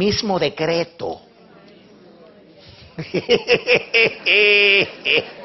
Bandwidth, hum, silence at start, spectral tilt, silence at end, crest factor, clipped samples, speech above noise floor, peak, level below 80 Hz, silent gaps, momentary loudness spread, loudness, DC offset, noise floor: 6.4 kHz; none; 0 s; -1 dB/octave; 0 s; 18 dB; under 0.1%; 29 dB; 0 dBFS; -52 dBFS; none; 18 LU; -16 LUFS; under 0.1%; -46 dBFS